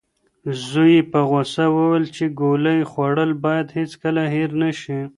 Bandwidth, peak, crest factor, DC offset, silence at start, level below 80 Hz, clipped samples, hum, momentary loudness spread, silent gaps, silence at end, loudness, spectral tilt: 11 kHz; -4 dBFS; 16 dB; under 0.1%; 0.45 s; -62 dBFS; under 0.1%; none; 10 LU; none; 0.1 s; -19 LUFS; -7 dB/octave